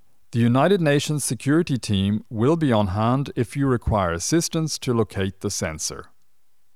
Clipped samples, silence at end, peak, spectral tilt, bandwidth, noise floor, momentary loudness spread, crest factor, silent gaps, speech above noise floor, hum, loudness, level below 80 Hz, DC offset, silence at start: under 0.1%; 0.7 s; -6 dBFS; -5.5 dB/octave; 15.5 kHz; -72 dBFS; 8 LU; 16 dB; none; 50 dB; none; -22 LUFS; -44 dBFS; 0.4%; 0.3 s